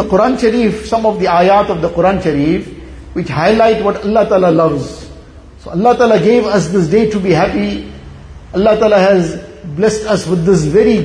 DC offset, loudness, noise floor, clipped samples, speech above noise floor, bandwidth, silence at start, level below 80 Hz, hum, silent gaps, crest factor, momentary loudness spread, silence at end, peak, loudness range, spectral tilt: under 0.1%; -12 LUFS; -35 dBFS; under 0.1%; 24 dB; 10.5 kHz; 0 s; -34 dBFS; none; none; 12 dB; 13 LU; 0 s; 0 dBFS; 1 LU; -6.5 dB/octave